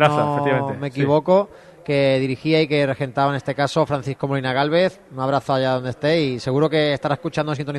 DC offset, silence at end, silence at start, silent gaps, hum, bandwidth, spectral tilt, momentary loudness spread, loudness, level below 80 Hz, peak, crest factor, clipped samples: under 0.1%; 0 s; 0 s; none; none; 11.5 kHz; -6.5 dB/octave; 6 LU; -20 LUFS; -56 dBFS; -2 dBFS; 18 dB; under 0.1%